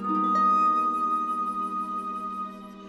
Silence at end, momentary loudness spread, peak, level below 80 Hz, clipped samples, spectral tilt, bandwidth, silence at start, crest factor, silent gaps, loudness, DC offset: 0 s; 12 LU; -14 dBFS; -66 dBFS; under 0.1%; -6.5 dB/octave; 12 kHz; 0 s; 12 dB; none; -25 LUFS; under 0.1%